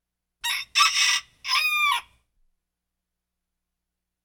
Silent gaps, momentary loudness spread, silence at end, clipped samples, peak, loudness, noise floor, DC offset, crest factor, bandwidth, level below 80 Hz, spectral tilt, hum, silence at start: none; 10 LU; 2.25 s; under 0.1%; -6 dBFS; -22 LUFS; -84 dBFS; under 0.1%; 22 dB; 19.5 kHz; -68 dBFS; 5 dB/octave; 60 Hz at -75 dBFS; 0.45 s